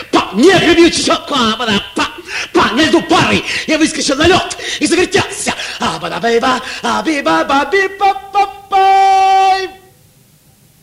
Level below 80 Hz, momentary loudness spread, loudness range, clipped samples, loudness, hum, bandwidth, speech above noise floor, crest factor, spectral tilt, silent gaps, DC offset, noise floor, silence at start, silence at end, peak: -42 dBFS; 9 LU; 3 LU; under 0.1%; -12 LUFS; none; 15.5 kHz; 36 dB; 12 dB; -3.5 dB/octave; none; under 0.1%; -47 dBFS; 0 s; 1.05 s; 0 dBFS